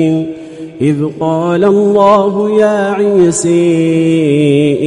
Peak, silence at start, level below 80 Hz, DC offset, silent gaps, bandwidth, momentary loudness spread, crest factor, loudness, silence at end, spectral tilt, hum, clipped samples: 0 dBFS; 0 s; -50 dBFS; under 0.1%; none; 11.5 kHz; 7 LU; 10 dB; -10 LUFS; 0 s; -6.5 dB/octave; none; under 0.1%